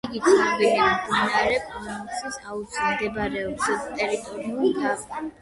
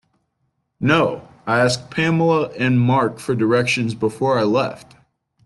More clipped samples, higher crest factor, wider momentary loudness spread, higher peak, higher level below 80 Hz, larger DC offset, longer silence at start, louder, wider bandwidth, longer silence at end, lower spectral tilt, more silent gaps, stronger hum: neither; about the same, 18 dB vs 16 dB; first, 13 LU vs 6 LU; about the same, -6 dBFS vs -4 dBFS; about the same, -52 dBFS vs -56 dBFS; neither; second, 0.05 s vs 0.8 s; second, -24 LUFS vs -18 LUFS; about the same, 11.5 kHz vs 12 kHz; second, 0.1 s vs 0.65 s; second, -3.5 dB/octave vs -6 dB/octave; neither; neither